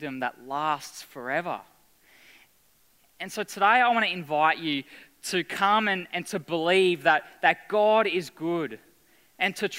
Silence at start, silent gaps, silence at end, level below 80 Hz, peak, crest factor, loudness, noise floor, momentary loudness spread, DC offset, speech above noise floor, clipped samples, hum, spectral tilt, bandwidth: 0 s; none; 0 s; -76 dBFS; -6 dBFS; 22 dB; -25 LUFS; -64 dBFS; 13 LU; under 0.1%; 38 dB; under 0.1%; none; -4 dB/octave; 16 kHz